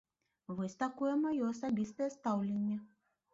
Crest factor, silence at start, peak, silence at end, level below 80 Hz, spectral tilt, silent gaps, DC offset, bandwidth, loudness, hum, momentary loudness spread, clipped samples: 14 dB; 0.5 s; -24 dBFS; 0.5 s; -76 dBFS; -7.5 dB/octave; none; under 0.1%; 7.6 kHz; -37 LUFS; none; 8 LU; under 0.1%